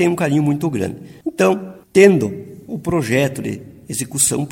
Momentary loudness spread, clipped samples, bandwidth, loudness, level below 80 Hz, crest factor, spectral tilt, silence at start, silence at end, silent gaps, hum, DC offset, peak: 16 LU; under 0.1%; 16.5 kHz; -17 LUFS; -50 dBFS; 18 dB; -5 dB/octave; 0 s; 0 s; none; none; under 0.1%; 0 dBFS